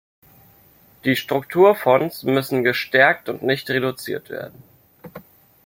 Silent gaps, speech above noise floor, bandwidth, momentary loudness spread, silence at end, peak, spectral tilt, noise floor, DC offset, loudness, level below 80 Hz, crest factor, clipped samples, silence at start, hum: none; 34 dB; 17 kHz; 14 LU; 0.45 s; -2 dBFS; -5.5 dB/octave; -53 dBFS; under 0.1%; -19 LUFS; -62 dBFS; 20 dB; under 0.1%; 1.05 s; none